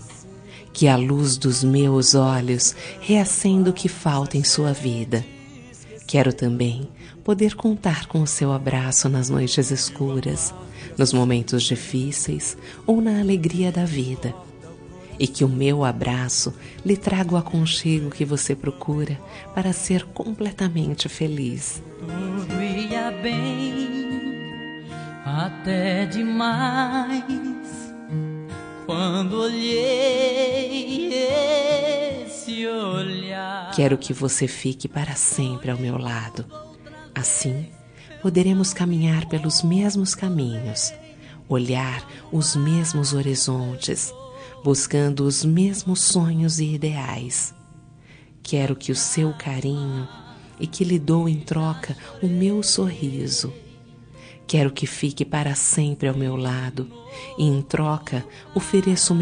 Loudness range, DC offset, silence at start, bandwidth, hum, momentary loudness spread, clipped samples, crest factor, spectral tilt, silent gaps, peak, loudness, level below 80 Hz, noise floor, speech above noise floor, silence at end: 5 LU; under 0.1%; 0 s; 10 kHz; none; 13 LU; under 0.1%; 20 dB; -4.5 dB/octave; none; -2 dBFS; -22 LUFS; -52 dBFS; -48 dBFS; 26 dB; 0 s